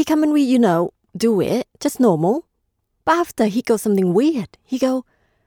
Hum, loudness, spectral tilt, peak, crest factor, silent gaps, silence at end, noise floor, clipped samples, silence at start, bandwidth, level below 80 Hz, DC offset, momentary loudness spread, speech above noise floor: none; -19 LUFS; -6 dB/octave; -4 dBFS; 14 dB; none; 0.45 s; -71 dBFS; under 0.1%; 0 s; 18.5 kHz; -58 dBFS; under 0.1%; 10 LU; 54 dB